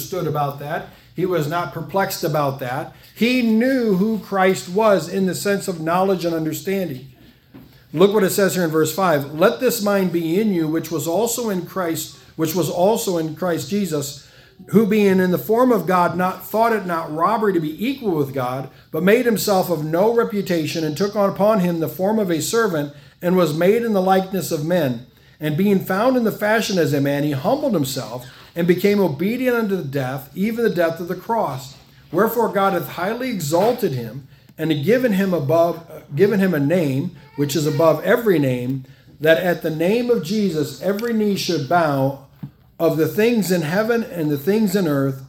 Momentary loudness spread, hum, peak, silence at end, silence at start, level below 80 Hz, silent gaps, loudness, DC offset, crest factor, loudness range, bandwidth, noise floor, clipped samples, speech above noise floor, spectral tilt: 9 LU; none; 0 dBFS; 0 s; 0 s; -58 dBFS; none; -19 LUFS; under 0.1%; 18 dB; 3 LU; 18 kHz; -45 dBFS; under 0.1%; 27 dB; -5.5 dB/octave